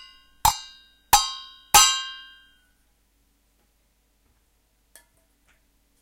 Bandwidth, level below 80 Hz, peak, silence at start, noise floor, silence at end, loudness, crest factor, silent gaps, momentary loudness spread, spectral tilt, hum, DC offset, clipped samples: 16 kHz; -46 dBFS; -2 dBFS; 0.45 s; -66 dBFS; 3.85 s; -19 LUFS; 26 dB; none; 23 LU; 1 dB/octave; none; under 0.1%; under 0.1%